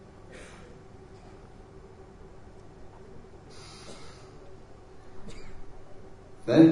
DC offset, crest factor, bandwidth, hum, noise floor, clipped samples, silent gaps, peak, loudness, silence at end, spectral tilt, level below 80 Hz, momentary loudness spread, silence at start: under 0.1%; 26 dB; 10.5 kHz; none; -49 dBFS; under 0.1%; none; -6 dBFS; -27 LUFS; 0 s; -7.5 dB/octave; -52 dBFS; 6 LU; 0.35 s